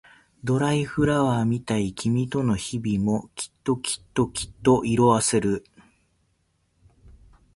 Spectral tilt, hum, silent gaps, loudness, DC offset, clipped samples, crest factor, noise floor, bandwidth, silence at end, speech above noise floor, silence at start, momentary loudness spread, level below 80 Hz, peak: -5.5 dB/octave; none; none; -24 LUFS; under 0.1%; under 0.1%; 20 dB; -69 dBFS; 11.5 kHz; 1.95 s; 46 dB; 0.45 s; 8 LU; -50 dBFS; -6 dBFS